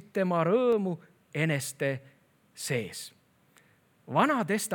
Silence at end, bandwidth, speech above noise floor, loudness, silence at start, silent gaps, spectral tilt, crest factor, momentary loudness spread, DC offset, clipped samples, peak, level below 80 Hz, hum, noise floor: 0 s; 19.5 kHz; 36 dB; -29 LUFS; 0.15 s; none; -5 dB/octave; 20 dB; 14 LU; under 0.1%; under 0.1%; -10 dBFS; -80 dBFS; none; -64 dBFS